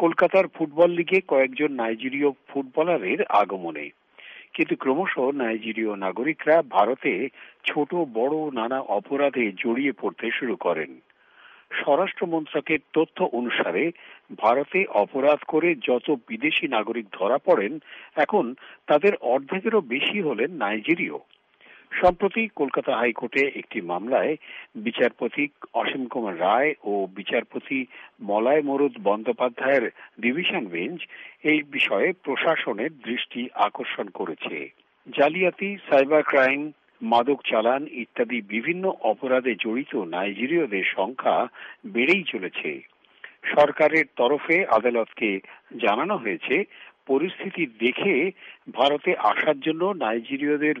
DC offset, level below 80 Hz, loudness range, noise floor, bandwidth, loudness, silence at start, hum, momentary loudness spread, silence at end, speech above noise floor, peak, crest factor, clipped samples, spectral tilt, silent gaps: under 0.1%; -64 dBFS; 3 LU; -53 dBFS; 7.6 kHz; -24 LUFS; 0 s; none; 10 LU; 0 s; 29 dB; -6 dBFS; 18 dB; under 0.1%; -2.5 dB/octave; none